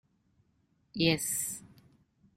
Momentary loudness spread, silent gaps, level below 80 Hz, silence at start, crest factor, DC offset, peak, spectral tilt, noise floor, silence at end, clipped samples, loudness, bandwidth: 16 LU; none; -66 dBFS; 0.95 s; 22 dB; under 0.1%; -14 dBFS; -3.5 dB/octave; -72 dBFS; 0.7 s; under 0.1%; -30 LUFS; 16 kHz